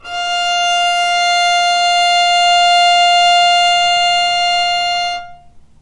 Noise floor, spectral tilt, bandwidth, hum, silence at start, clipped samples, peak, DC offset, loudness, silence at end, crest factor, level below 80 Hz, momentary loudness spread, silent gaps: -39 dBFS; 1.5 dB/octave; 11 kHz; none; 0.05 s; under 0.1%; -2 dBFS; under 0.1%; -11 LUFS; 0.45 s; 10 dB; -50 dBFS; 7 LU; none